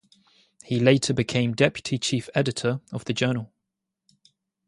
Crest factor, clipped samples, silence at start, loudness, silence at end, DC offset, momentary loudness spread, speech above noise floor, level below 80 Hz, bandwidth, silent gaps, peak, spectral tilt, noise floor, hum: 22 dB; under 0.1%; 0.7 s; -24 LUFS; 1.25 s; under 0.1%; 10 LU; 59 dB; -58 dBFS; 11.5 kHz; none; -4 dBFS; -5 dB/octave; -83 dBFS; none